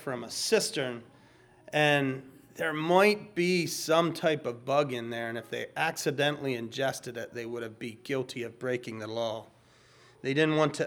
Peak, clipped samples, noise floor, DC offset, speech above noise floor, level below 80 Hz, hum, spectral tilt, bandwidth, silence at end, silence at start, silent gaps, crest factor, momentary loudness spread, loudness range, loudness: -8 dBFS; under 0.1%; -59 dBFS; under 0.1%; 30 dB; -74 dBFS; none; -4.5 dB/octave; over 20 kHz; 0 s; 0 s; none; 22 dB; 13 LU; 8 LU; -30 LUFS